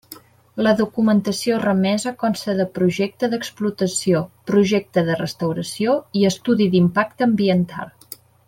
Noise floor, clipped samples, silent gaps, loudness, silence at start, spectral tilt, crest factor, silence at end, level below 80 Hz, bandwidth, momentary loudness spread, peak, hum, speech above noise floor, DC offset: -44 dBFS; under 0.1%; none; -20 LUFS; 0.1 s; -5.5 dB/octave; 16 dB; 0.6 s; -58 dBFS; 16.5 kHz; 7 LU; -4 dBFS; none; 25 dB; under 0.1%